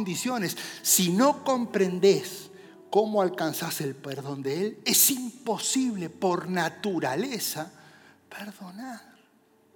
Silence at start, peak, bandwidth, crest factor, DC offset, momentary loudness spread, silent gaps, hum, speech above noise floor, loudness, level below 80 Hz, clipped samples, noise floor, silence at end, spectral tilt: 0 s; -8 dBFS; 19.5 kHz; 20 dB; under 0.1%; 20 LU; none; none; 36 dB; -26 LUFS; -86 dBFS; under 0.1%; -62 dBFS; 0.75 s; -3.5 dB/octave